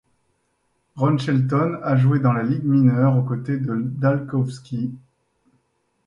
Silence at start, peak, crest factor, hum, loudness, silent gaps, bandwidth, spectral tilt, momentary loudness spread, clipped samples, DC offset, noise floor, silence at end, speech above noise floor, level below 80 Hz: 0.95 s; -4 dBFS; 16 dB; none; -21 LUFS; none; 7.4 kHz; -9 dB/octave; 9 LU; under 0.1%; under 0.1%; -69 dBFS; 1.1 s; 50 dB; -60 dBFS